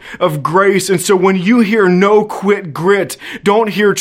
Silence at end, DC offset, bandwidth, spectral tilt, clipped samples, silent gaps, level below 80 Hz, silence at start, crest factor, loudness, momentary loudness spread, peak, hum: 0 s; under 0.1%; 16 kHz; -5 dB/octave; under 0.1%; none; -56 dBFS; 0.05 s; 12 dB; -12 LUFS; 6 LU; 0 dBFS; none